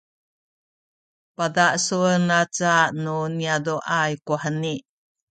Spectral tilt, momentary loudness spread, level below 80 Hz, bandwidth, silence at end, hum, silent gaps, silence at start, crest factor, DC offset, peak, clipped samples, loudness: -4 dB/octave; 8 LU; -68 dBFS; 9.2 kHz; 0.5 s; none; none; 1.4 s; 18 dB; under 0.1%; -4 dBFS; under 0.1%; -22 LUFS